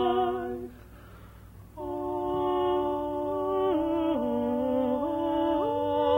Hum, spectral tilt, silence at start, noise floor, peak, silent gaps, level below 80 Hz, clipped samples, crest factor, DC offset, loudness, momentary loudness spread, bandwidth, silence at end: none; -7.5 dB/octave; 0 s; -48 dBFS; -14 dBFS; none; -52 dBFS; under 0.1%; 14 dB; under 0.1%; -28 LUFS; 10 LU; 16.5 kHz; 0 s